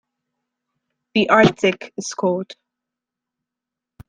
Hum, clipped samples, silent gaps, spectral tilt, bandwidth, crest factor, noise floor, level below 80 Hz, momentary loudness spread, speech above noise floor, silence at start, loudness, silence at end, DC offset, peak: none; under 0.1%; none; -5 dB/octave; 10 kHz; 20 dB; -86 dBFS; -54 dBFS; 15 LU; 68 dB; 1.15 s; -18 LUFS; 1.55 s; under 0.1%; -2 dBFS